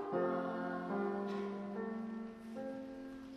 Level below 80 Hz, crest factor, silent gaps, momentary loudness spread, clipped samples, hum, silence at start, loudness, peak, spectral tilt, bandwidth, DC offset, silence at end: -74 dBFS; 16 dB; none; 10 LU; under 0.1%; none; 0 s; -41 LUFS; -26 dBFS; -8 dB/octave; 11 kHz; under 0.1%; 0 s